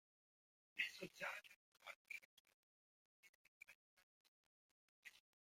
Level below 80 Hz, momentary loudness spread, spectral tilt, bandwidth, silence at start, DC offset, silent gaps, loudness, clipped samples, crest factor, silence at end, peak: under -90 dBFS; 19 LU; -2 dB/octave; 16.5 kHz; 0.75 s; under 0.1%; 1.56-1.72 s, 1.96-2.05 s, 2.25-2.45 s, 2.54-3.23 s, 3.29-3.61 s, 3.75-3.97 s, 4.03-5.03 s; -51 LUFS; under 0.1%; 28 dB; 0.3 s; -30 dBFS